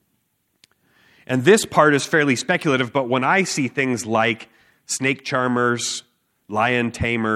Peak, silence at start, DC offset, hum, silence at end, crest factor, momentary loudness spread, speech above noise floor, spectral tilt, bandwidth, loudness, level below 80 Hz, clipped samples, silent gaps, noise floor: -2 dBFS; 1.3 s; under 0.1%; none; 0 s; 20 dB; 9 LU; 50 dB; -4 dB/octave; 15 kHz; -19 LUFS; -54 dBFS; under 0.1%; none; -69 dBFS